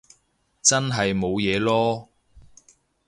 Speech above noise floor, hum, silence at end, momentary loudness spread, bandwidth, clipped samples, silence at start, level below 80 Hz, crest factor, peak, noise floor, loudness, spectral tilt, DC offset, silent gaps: 45 dB; none; 0.65 s; 5 LU; 11.5 kHz; under 0.1%; 0.65 s; -52 dBFS; 22 dB; -4 dBFS; -67 dBFS; -22 LUFS; -3.5 dB/octave; under 0.1%; none